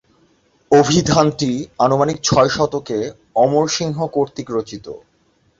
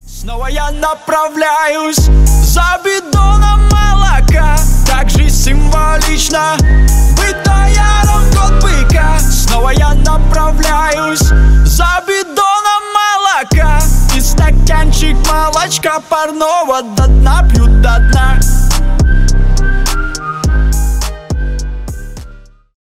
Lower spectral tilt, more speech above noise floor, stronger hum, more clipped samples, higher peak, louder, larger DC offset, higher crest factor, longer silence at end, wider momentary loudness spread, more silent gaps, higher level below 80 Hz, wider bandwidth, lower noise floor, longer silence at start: about the same, -5 dB/octave vs -4.5 dB/octave; first, 43 dB vs 27 dB; neither; neither; about the same, -2 dBFS vs 0 dBFS; second, -17 LUFS vs -11 LUFS; neither; first, 16 dB vs 8 dB; about the same, 0.6 s vs 0.5 s; first, 11 LU vs 7 LU; neither; second, -46 dBFS vs -10 dBFS; second, 7.8 kHz vs 16 kHz; first, -60 dBFS vs -34 dBFS; first, 0.7 s vs 0.05 s